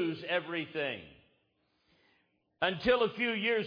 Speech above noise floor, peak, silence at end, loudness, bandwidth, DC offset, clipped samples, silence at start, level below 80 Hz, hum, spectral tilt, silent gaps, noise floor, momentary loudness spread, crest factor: 44 dB; -14 dBFS; 0 s; -32 LUFS; 5.2 kHz; under 0.1%; under 0.1%; 0 s; -64 dBFS; none; -6.5 dB/octave; none; -76 dBFS; 8 LU; 20 dB